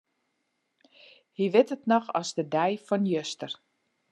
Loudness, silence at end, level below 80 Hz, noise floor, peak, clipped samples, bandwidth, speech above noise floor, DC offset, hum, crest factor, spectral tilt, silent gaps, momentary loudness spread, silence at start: -27 LUFS; 0.6 s; -86 dBFS; -78 dBFS; -8 dBFS; under 0.1%; 11.5 kHz; 51 dB; under 0.1%; none; 22 dB; -5.5 dB/octave; none; 14 LU; 1.4 s